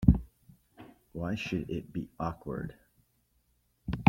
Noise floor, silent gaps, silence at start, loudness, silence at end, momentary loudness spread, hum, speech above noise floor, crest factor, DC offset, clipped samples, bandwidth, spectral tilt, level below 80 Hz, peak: -72 dBFS; none; 0 s; -36 LUFS; 0 s; 22 LU; none; 36 dB; 26 dB; under 0.1%; under 0.1%; 16 kHz; -8 dB/octave; -42 dBFS; -6 dBFS